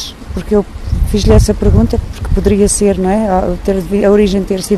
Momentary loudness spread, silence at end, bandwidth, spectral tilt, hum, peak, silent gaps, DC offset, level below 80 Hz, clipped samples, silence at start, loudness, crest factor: 9 LU; 0 s; 13.5 kHz; -6 dB/octave; none; 0 dBFS; none; under 0.1%; -18 dBFS; under 0.1%; 0 s; -12 LUFS; 12 dB